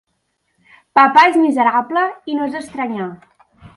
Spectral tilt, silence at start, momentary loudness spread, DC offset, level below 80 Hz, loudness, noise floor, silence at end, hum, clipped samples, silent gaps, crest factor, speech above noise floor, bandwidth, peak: -5 dB/octave; 0.95 s; 14 LU; under 0.1%; -60 dBFS; -15 LUFS; -68 dBFS; 0.1 s; none; under 0.1%; none; 16 dB; 54 dB; 11.5 kHz; 0 dBFS